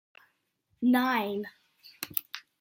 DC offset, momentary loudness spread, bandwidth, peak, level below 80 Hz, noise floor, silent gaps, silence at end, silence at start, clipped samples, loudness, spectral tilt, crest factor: under 0.1%; 17 LU; 16.5 kHz; -4 dBFS; -78 dBFS; -75 dBFS; none; 0.2 s; 0.8 s; under 0.1%; -29 LUFS; -4 dB/octave; 28 dB